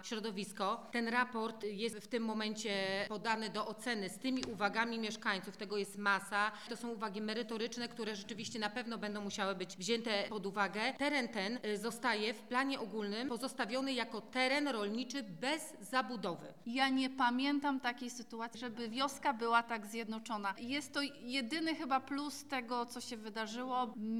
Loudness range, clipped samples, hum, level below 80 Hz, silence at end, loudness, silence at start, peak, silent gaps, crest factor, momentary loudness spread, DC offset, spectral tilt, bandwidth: 2 LU; under 0.1%; none; -80 dBFS; 0 s; -38 LUFS; 0 s; -18 dBFS; none; 20 dB; 8 LU; 0.1%; -3.5 dB/octave; 17 kHz